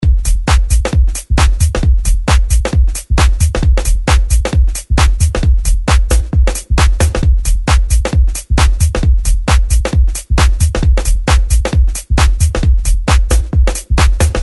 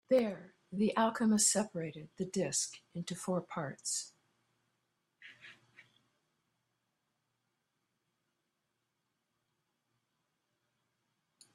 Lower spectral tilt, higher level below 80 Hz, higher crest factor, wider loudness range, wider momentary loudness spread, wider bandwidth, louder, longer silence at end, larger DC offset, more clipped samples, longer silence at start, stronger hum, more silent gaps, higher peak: first, -5 dB/octave vs -3.5 dB/octave; first, -12 dBFS vs -80 dBFS; second, 10 dB vs 22 dB; second, 0 LU vs 12 LU; second, 3 LU vs 17 LU; about the same, 12 kHz vs 13 kHz; first, -13 LUFS vs -34 LUFS; second, 0 s vs 6 s; first, 0.3% vs under 0.1%; neither; about the same, 0 s vs 0.1 s; neither; neither; first, 0 dBFS vs -18 dBFS